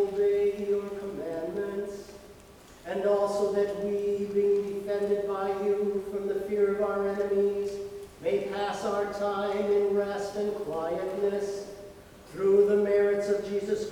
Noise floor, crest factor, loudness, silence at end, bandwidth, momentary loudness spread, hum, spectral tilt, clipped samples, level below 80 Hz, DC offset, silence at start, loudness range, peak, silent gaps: -51 dBFS; 16 dB; -29 LUFS; 0 s; 13.5 kHz; 11 LU; none; -6 dB/octave; under 0.1%; -60 dBFS; under 0.1%; 0 s; 3 LU; -12 dBFS; none